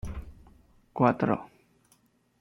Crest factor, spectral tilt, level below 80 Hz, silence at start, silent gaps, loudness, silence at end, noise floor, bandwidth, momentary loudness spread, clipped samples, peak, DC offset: 22 dB; -9 dB/octave; -50 dBFS; 0.05 s; none; -27 LUFS; 0.95 s; -66 dBFS; 11.5 kHz; 20 LU; under 0.1%; -8 dBFS; under 0.1%